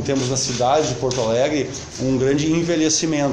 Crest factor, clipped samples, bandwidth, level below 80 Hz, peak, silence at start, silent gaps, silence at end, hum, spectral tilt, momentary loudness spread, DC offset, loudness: 14 dB; under 0.1%; 11 kHz; -46 dBFS; -6 dBFS; 0 s; none; 0 s; none; -4.5 dB/octave; 5 LU; under 0.1%; -19 LUFS